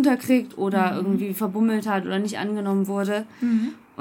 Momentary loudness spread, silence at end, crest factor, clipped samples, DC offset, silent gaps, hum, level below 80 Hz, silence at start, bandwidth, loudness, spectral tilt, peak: 5 LU; 0.2 s; 14 dB; under 0.1%; under 0.1%; none; none; -72 dBFS; 0 s; 17 kHz; -24 LUFS; -6.5 dB/octave; -8 dBFS